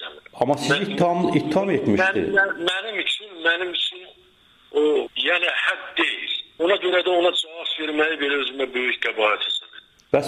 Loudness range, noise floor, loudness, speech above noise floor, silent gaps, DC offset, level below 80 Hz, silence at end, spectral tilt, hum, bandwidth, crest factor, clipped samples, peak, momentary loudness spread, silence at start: 2 LU; -55 dBFS; -21 LUFS; 34 dB; none; under 0.1%; -62 dBFS; 0 s; -4.5 dB/octave; none; 12.5 kHz; 16 dB; under 0.1%; -6 dBFS; 6 LU; 0 s